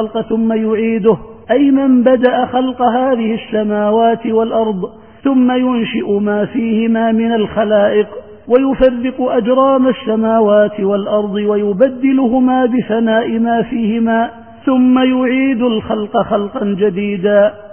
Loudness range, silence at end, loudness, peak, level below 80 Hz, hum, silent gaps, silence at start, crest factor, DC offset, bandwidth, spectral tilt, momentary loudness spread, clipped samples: 2 LU; 0 s; -13 LUFS; 0 dBFS; -46 dBFS; none; none; 0 s; 12 dB; 0.4%; 3.3 kHz; -12 dB/octave; 6 LU; under 0.1%